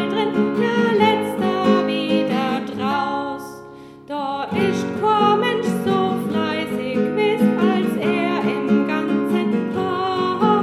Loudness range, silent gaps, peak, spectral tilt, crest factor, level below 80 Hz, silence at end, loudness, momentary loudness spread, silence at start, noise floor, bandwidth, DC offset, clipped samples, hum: 3 LU; none; -4 dBFS; -6.5 dB/octave; 16 dB; -62 dBFS; 0 s; -20 LUFS; 7 LU; 0 s; -39 dBFS; 14 kHz; under 0.1%; under 0.1%; none